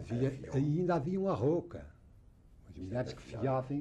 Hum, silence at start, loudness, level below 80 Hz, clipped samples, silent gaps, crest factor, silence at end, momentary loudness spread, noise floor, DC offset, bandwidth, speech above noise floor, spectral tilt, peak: none; 0 s; -34 LUFS; -58 dBFS; under 0.1%; none; 14 dB; 0 s; 17 LU; -59 dBFS; under 0.1%; 9 kHz; 26 dB; -8.5 dB/octave; -20 dBFS